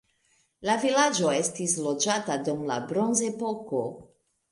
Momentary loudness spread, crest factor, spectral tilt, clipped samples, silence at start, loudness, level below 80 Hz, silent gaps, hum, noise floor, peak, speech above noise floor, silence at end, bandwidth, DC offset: 9 LU; 18 dB; -3 dB/octave; under 0.1%; 0.6 s; -27 LUFS; -70 dBFS; none; none; -69 dBFS; -10 dBFS; 42 dB; 0.45 s; 11.5 kHz; under 0.1%